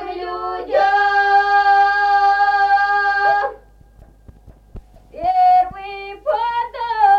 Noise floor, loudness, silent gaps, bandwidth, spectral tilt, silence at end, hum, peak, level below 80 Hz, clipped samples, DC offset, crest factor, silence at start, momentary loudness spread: -46 dBFS; -16 LUFS; none; 7 kHz; -3.5 dB/octave; 0 s; 50 Hz at -50 dBFS; -4 dBFS; -46 dBFS; under 0.1%; under 0.1%; 14 dB; 0 s; 12 LU